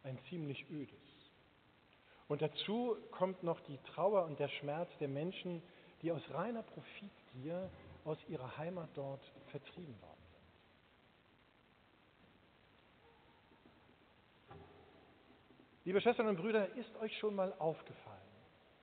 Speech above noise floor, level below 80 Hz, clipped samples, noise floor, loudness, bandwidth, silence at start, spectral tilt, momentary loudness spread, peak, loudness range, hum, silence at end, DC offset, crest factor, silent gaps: 29 dB; -80 dBFS; under 0.1%; -70 dBFS; -41 LUFS; 4.5 kHz; 0.05 s; -4.5 dB/octave; 23 LU; -22 dBFS; 13 LU; none; 0.35 s; under 0.1%; 22 dB; none